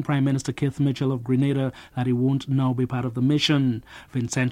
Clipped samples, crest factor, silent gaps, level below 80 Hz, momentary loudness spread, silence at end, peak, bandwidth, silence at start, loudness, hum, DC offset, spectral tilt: under 0.1%; 14 dB; none; -54 dBFS; 8 LU; 0 s; -8 dBFS; 11.5 kHz; 0 s; -24 LUFS; none; under 0.1%; -6 dB/octave